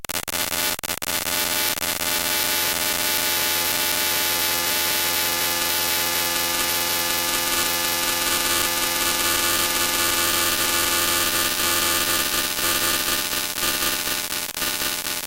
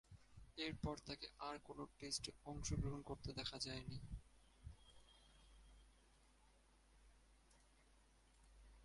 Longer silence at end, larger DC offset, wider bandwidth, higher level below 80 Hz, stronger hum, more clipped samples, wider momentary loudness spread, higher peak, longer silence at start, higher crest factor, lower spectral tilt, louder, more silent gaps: about the same, 0 s vs 0 s; neither; first, 17.5 kHz vs 11.5 kHz; first, -48 dBFS vs -62 dBFS; neither; neither; second, 4 LU vs 22 LU; first, -6 dBFS vs -30 dBFS; about the same, 0 s vs 0.1 s; second, 16 dB vs 22 dB; second, 0 dB/octave vs -4 dB/octave; first, -20 LUFS vs -50 LUFS; neither